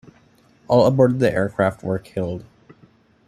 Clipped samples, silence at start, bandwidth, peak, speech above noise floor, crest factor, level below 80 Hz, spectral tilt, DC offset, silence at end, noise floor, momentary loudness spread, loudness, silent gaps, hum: under 0.1%; 0.7 s; 13 kHz; -2 dBFS; 36 dB; 18 dB; -52 dBFS; -7.5 dB/octave; under 0.1%; 0.85 s; -55 dBFS; 12 LU; -19 LUFS; none; none